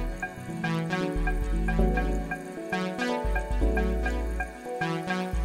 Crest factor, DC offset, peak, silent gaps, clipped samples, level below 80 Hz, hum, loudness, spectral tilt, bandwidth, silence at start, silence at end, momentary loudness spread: 16 dB; under 0.1%; -12 dBFS; none; under 0.1%; -30 dBFS; none; -30 LUFS; -6.5 dB/octave; 14 kHz; 0 s; 0 s; 8 LU